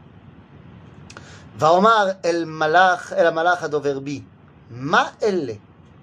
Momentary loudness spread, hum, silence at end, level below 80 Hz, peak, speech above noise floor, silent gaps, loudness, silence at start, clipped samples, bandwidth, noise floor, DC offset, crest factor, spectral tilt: 17 LU; none; 0.45 s; -60 dBFS; -2 dBFS; 27 dB; none; -19 LUFS; 0.65 s; under 0.1%; 10.5 kHz; -45 dBFS; under 0.1%; 20 dB; -5 dB/octave